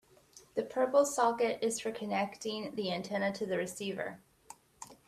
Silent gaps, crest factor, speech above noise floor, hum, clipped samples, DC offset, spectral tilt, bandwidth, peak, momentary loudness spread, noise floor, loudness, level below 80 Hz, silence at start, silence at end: none; 18 dB; 27 dB; none; under 0.1%; under 0.1%; -4 dB/octave; 15 kHz; -16 dBFS; 12 LU; -60 dBFS; -34 LUFS; -74 dBFS; 0.35 s; 0.15 s